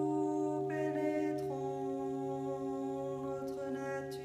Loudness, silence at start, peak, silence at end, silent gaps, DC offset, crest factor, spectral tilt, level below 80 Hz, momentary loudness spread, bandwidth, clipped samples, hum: -37 LUFS; 0 s; -24 dBFS; 0 s; none; under 0.1%; 12 dB; -7.5 dB/octave; -70 dBFS; 5 LU; 14.5 kHz; under 0.1%; none